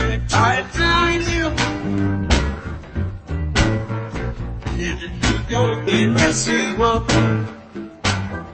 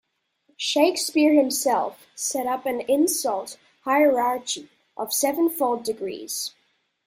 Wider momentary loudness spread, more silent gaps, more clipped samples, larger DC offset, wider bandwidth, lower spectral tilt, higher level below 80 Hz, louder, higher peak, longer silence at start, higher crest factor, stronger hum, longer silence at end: about the same, 11 LU vs 13 LU; neither; neither; neither; second, 8.8 kHz vs 16 kHz; first, -4.5 dB/octave vs -1.5 dB/octave; first, -30 dBFS vs -72 dBFS; first, -19 LUFS vs -23 LUFS; first, -2 dBFS vs -6 dBFS; second, 0 s vs 0.6 s; about the same, 18 dB vs 18 dB; neither; second, 0 s vs 0.6 s